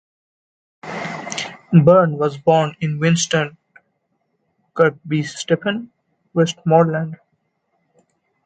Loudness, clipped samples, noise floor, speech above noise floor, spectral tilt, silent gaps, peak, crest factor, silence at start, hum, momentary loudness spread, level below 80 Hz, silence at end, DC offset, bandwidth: -18 LUFS; under 0.1%; -69 dBFS; 53 dB; -5.5 dB/octave; none; 0 dBFS; 20 dB; 0.85 s; none; 14 LU; -60 dBFS; 1.3 s; under 0.1%; 9.2 kHz